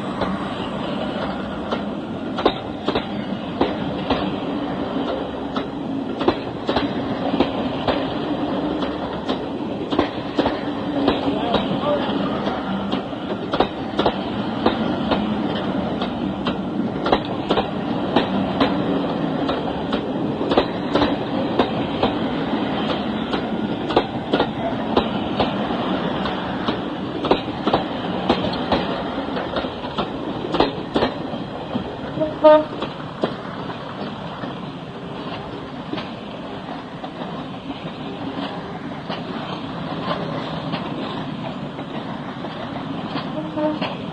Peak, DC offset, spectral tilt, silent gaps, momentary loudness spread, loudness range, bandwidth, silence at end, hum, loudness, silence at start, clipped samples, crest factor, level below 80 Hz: -2 dBFS; under 0.1%; -7 dB/octave; none; 9 LU; 8 LU; 9.4 kHz; 0 s; none; -23 LUFS; 0 s; under 0.1%; 22 dB; -44 dBFS